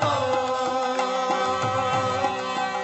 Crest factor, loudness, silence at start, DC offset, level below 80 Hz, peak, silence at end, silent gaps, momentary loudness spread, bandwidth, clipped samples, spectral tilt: 14 dB; -24 LUFS; 0 s; under 0.1%; -62 dBFS; -10 dBFS; 0 s; none; 2 LU; 8.4 kHz; under 0.1%; -4 dB/octave